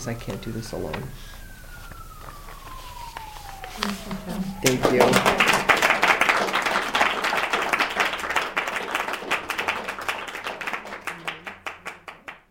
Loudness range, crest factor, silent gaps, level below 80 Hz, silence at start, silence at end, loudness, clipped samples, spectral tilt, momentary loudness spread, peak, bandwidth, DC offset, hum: 16 LU; 22 dB; none; -46 dBFS; 0 s; 0.15 s; -23 LUFS; under 0.1%; -3 dB/octave; 23 LU; -2 dBFS; 16.5 kHz; under 0.1%; none